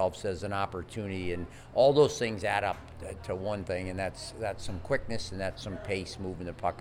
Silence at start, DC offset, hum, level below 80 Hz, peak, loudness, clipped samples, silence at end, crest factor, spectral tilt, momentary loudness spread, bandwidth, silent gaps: 0 s; under 0.1%; none; -50 dBFS; -12 dBFS; -32 LUFS; under 0.1%; 0 s; 20 dB; -5 dB/octave; 13 LU; 15.5 kHz; none